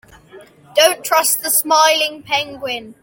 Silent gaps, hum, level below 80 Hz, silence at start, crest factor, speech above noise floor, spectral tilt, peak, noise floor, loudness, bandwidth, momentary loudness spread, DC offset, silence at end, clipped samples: none; none; -60 dBFS; 0.35 s; 16 dB; 27 dB; 0 dB/octave; 0 dBFS; -43 dBFS; -15 LUFS; 17 kHz; 11 LU; under 0.1%; 0.1 s; under 0.1%